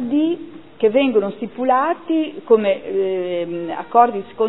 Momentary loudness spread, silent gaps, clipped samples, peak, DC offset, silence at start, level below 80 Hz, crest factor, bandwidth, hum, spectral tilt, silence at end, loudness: 10 LU; none; under 0.1%; 0 dBFS; 0.5%; 0 s; -64 dBFS; 18 dB; 4.1 kHz; none; -10 dB/octave; 0 s; -19 LUFS